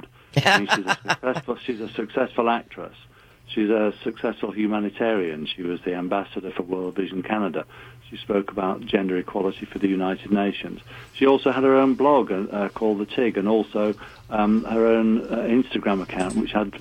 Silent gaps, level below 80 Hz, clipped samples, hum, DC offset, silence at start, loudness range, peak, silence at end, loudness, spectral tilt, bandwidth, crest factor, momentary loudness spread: none; -54 dBFS; under 0.1%; none; under 0.1%; 0.35 s; 6 LU; -4 dBFS; 0 s; -23 LUFS; -6 dB/octave; 14 kHz; 18 dB; 11 LU